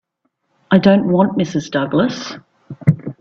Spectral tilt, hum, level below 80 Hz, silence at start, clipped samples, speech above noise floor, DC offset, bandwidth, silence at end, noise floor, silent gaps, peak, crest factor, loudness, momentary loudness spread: -7 dB/octave; none; -52 dBFS; 0.7 s; under 0.1%; 54 dB; under 0.1%; 7 kHz; 0.1 s; -69 dBFS; none; 0 dBFS; 16 dB; -16 LUFS; 13 LU